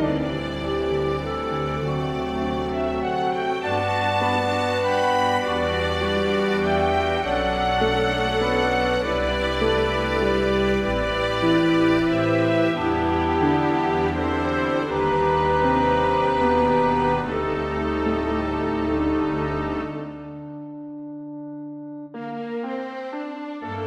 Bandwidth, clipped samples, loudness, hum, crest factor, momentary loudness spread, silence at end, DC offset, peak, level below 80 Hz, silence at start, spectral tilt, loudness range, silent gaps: 13 kHz; under 0.1%; -22 LUFS; none; 14 dB; 12 LU; 0 s; under 0.1%; -8 dBFS; -38 dBFS; 0 s; -6 dB/octave; 7 LU; none